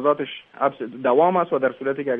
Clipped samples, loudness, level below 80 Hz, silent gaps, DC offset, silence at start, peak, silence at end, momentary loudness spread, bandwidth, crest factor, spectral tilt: under 0.1%; -22 LUFS; -70 dBFS; none; under 0.1%; 0 s; -4 dBFS; 0 s; 8 LU; 3.9 kHz; 16 dB; -9.5 dB/octave